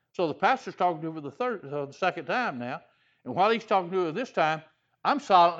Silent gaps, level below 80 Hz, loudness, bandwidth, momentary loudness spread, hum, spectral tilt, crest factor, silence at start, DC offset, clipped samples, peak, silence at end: none; -78 dBFS; -28 LUFS; 8 kHz; 11 LU; none; -5.5 dB/octave; 20 dB; 0.2 s; under 0.1%; under 0.1%; -8 dBFS; 0 s